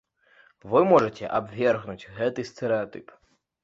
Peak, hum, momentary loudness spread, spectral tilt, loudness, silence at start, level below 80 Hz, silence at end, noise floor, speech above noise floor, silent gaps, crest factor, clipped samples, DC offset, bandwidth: -6 dBFS; none; 15 LU; -7 dB/octave; -25 LUFS; 0.65 s; -62 dBFS; 0.6 s; -59 dBFS; 35 dB; none; 20 dB; under 0.1%; under 0.1%; 7.8 kHz